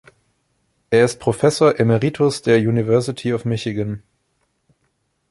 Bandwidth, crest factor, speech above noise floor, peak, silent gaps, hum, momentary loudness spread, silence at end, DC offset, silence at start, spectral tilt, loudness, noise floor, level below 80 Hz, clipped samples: 11.5 kHz; 18 dB; 51 dB; -2 dBFS; none; none; 9 LU; 1.35 s; under 0.1%; 0.9 s; -6 dB/octave; -18 LUFS; -68 dBFS; -52 dBFS; under 0.1%